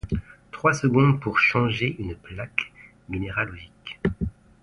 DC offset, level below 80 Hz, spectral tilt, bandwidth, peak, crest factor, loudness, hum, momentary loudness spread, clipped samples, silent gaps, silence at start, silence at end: under 0.1%; -42 dBFS; -6.5 dB/octave; 11 kHz; -4 dBFS; 20 dB; -24 LUFS; none; 16 LU; under 0.1%; none; 0.05 s; 0.3 s